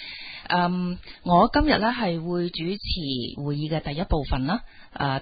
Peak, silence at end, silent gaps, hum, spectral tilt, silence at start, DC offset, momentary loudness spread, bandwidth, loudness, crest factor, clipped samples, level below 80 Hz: -6 dBFS; 0 s; none; none; -11 dB/octave; 0 s; under 0.1%; 11 LU; 5 kHz; -25 LUFS; 20 dB; under 0.1%; -36 dBFS